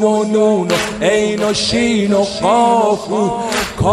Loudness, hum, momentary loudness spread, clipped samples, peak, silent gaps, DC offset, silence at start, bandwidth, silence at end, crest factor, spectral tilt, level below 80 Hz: -14 LUFS; none; 5 LU; under 0.1%; 0 dBFS; none; under 0.1%; 0 s; 15 kHz; 0 s; 14 dB; -4.5 dB/octave; -40 dBFS